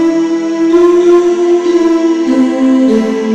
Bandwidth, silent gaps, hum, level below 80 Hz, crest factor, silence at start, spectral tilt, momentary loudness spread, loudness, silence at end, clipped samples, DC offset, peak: 8.4 kHz; none; none; -48 dBFS; 8 dB; 0 s; -5.5 dB/octave; 5 LU; -10 LUFS; 0 s; under 0.1%; under 0.1%; 0 dBFS